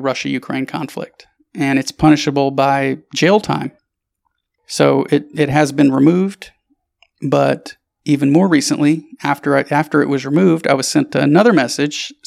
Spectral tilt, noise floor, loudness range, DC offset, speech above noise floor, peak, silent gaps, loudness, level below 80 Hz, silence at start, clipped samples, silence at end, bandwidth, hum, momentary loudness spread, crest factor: -5.5 dB/octave; -71 dBFS; 2 LU; under 0.1%; 57 dB; 0 dBFS; none; -15 LUFS; -50 dBFS; 0 s; under 0.1%; 0.15 s; 14 kHz; none; 12 LU; 16 dB